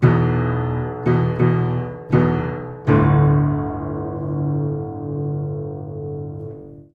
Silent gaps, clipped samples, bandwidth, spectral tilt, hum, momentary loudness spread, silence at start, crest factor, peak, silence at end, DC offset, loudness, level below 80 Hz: none; under 0.1%; 4.7 kHz; -11 dB/octave; none; 14 LU; 0 s; 18 dB; -2 dBFS; 0.1 s; under 0.1%; -20 LUFS; -38 dBFS